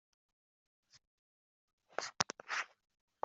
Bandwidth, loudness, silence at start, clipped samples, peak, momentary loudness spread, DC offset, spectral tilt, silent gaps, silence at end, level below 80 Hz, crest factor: 8.2 kHz; -40 LUFS; 0.95 s; under 0.1%; -10 dBFS; 10 LU; under 0.1%; -1 dB/octave; 1.07-1.78 s; 0.55 s; -86 dBFS; 36 dB